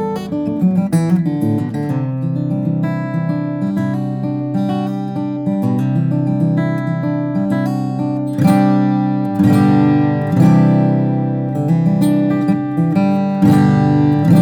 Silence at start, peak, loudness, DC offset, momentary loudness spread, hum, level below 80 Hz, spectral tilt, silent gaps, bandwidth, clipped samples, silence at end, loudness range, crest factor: 0 s; 0 dBFS; -15 LUFS; under 0.1%; 8 LU; none; -52 dBFS; -9 dB/octave; none; 19 kHz; under 0.1%; 0 s; 6 LU; 14 dB